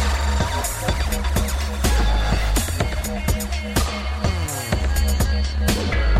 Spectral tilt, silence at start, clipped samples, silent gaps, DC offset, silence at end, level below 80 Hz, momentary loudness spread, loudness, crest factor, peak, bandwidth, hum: -4.5 dB/octave; 0 s; under 0.1%; none; under 0.1%; 0 s; -22 dBFS; 3 LU; -22 LUFS; 14 dB; -6 dBFS; 16 kHz; none